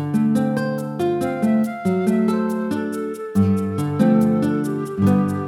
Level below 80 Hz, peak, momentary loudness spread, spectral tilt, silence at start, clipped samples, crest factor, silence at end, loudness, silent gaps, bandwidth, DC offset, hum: -62 dBFS; -4 dBFS; 7 LU; -8 dB/octave; 0 s; under 0.1%; 14 dB; 0 s; -20 LUFS; none; 15 kHz; under 0.1%; none